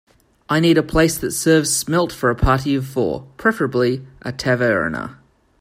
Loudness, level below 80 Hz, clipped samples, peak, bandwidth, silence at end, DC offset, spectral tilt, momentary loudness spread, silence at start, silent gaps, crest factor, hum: -18 LUFS; -36 dBFS; under 0.1%; -2 dBFS; 16 kHz; 0.45 s; under 0.1%; -4.5 dB/octave; 9 LU; 0.5 s; none; 16 dB; none